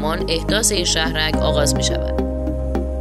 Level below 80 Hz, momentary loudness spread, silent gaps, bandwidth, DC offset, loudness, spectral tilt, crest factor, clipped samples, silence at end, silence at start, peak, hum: -24 dBFS; 7 LU; none; 14 kHz; under 0.1%; -19 LUFS; -3.5 dB/octave; 16 dB; under 0.1%; 0 s; 0 s; -2 dBFS; none